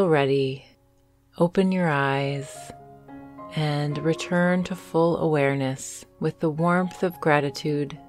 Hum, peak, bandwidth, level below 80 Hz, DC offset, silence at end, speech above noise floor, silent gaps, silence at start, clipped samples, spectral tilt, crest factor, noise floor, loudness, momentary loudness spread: none; -6 dBFS; 14 kHz; -60 dBFS; under 0.1%; 0 s; 37 dB; none; 0 s; under 0.1%; -6.5 dB/octave; 20 dB; -61 dBFS; -24 LUFS; 17 LU